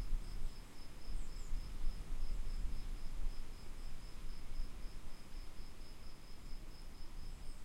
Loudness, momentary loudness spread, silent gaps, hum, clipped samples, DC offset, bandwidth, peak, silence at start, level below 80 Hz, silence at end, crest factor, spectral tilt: -52 LUFS; 8 LU; none; none; under 0.1%; under 0.1%; 12 kHz; -24 dBFS; 0 s; -42 dBFS; 0 s; 14 dB; -4.5 dB/octave